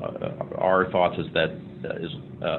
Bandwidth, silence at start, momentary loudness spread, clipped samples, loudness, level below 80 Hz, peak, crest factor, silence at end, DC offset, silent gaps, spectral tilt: 4.3 kHz; 0 s; 13 LU; under 0.1%; -26 LUFS; -56 dBFS; -6 dBFS; 20 dB; 0 s; under 0.1%; none; -9 dB/octave